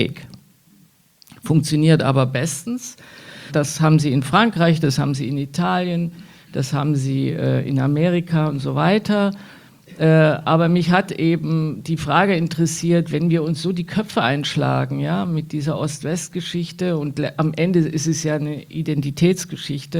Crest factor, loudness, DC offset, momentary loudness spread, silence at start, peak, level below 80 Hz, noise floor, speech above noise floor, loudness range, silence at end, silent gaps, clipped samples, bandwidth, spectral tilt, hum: 18 dB; -19 LUFS; under 0.1%; 9 LU; 0 s; -2 dBFS; -54 dBFS; -54 dBFS; 35 dB; 4 LU; 0 s; none; under 0.1%; 15 kHz; -6 dB/octave; none